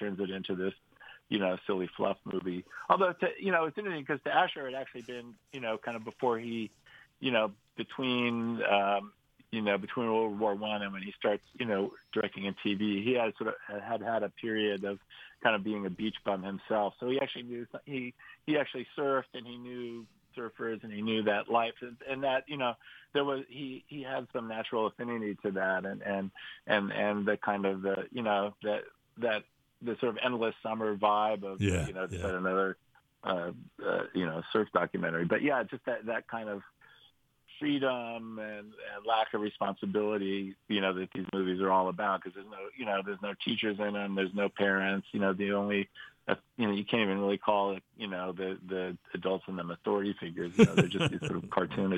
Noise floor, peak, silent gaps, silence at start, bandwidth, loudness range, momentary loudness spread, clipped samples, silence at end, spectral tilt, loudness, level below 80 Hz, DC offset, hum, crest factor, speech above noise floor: -66 dBFS; -8 dBFS; none; 0 s; 10.5 kHz; 4 LU; 12 LU; under 0.1%; 0 s; -6 dB/octave; -33 LUFS; -66 dBFS; under 0.1%; none; 24 dB; 33 dB